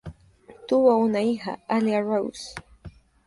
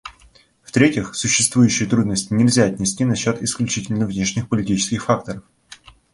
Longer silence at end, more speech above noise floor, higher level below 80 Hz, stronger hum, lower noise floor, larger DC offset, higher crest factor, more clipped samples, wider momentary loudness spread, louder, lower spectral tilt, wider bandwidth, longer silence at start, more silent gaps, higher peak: about the same, 0.35 s vs 0.4 s; second, 29 dB vs 34 dB; second, -54 dBFS vs -48 dBFS; neither; about the same, -51 dBFS vs -52 dBFS; neither; about the same, 18 dB vs 18 dB; neither; first, 21 LU vs 7 LU; second, -23 LUFS vs -19 LUFS; first, -6 dB/octave vs -4.5 dB/octave; about the same, 11.5 kHz vs 11.5 kHz; about the same, 0.05 s vs 0.05 s; neither; second, -6 dBFS vs -2 dBFS